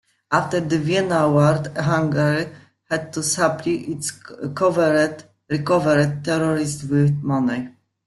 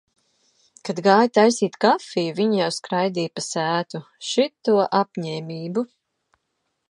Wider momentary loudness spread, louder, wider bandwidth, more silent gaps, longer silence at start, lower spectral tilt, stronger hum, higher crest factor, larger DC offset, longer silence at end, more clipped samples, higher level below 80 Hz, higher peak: second, 10 LU vs 13 LU; about the same, -20 LUFS vs -21 LUFS; about the same, 12 kHz vs 11.5 kHz; neither; second, 0.3 s vs 0.85 s; about the same, -5.5 dB/octave vs -4.5 dB/octave; neither; about the same, 18 dB vs 22 dB; neither; second, 0.35 s vs 1.05 s; neither; first, -56 dBFS vs -74 dBFS; about the same, -2 dBFS vs -2 dBFS